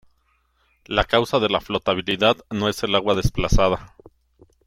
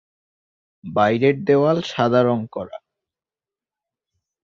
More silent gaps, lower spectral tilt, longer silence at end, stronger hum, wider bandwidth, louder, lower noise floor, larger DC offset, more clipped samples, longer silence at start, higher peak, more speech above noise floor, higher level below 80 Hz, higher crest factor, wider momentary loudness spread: neither; second, -5 dB/octave vs -7 dB/octave; second, 0.8 s vs 1.7 s; neither; first, 16.5 kHz vs 7.4 kHz; about the same, -21 LUFS vs -19 LUFS; second, -65 dBFS vs under -90 dBFS; neither; neither; about the same, 0.9 s vs 0.85 s; about the same, -4 dBFS vs -4 dBFS; second, 45 dB vs over 72 dB; first, -32 dBFS vs -60 dBFS; about the same, 20 dB vs 18 dB; second, 4 LU vs 14 LU